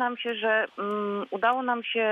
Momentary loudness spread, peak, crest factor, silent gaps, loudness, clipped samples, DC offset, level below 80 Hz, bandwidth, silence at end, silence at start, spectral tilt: 5 LU; -10 dBFS; 16 dB; none; -27 LUFS; under 0.1%; under 0.1%; -78 dBFS; 6.6 kHz; 0 s; 0 s; -6 dB/octave